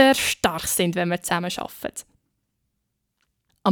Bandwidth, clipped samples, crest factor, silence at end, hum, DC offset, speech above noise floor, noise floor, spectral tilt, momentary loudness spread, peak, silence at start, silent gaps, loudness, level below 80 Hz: over 20 kHz; under 0.1%; 20 dB; 0 s; none; under 0.1%; 52 dB; -77 dBFS; -3.5 dB/octave; 13 LU; -4 dBFS; 0 s; none; -23 LUFS; -54 dBFS